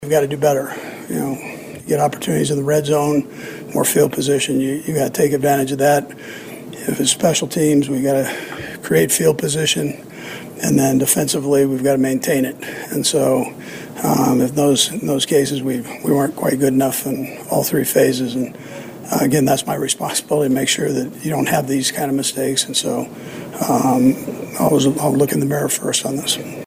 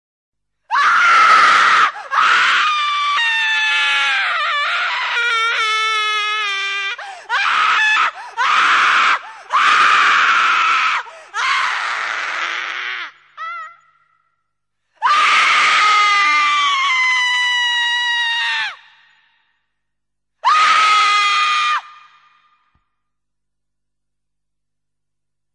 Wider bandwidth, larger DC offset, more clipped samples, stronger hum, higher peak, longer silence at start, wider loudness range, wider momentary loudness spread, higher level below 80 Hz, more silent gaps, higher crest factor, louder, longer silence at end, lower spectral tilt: first, 16 kHz vs 11.5 kHz; neither; neither; second, none vs 50 Hz at -75 dBFS; about the same, 0 dBFS vs 0 dBFS; second, 0 s vs 0.7 s; second, 2 LU vs 8 LU; first, 13 LU vs 10 LU; first, -54 dBFS vs -72 dBFS; neither; about the same, 16 dB vs 16 dB; second, -17 LUFS vs -14 LUFS; second, 0 s vs 3.65 s; first, -4 dB/octave vs 2 dB/octave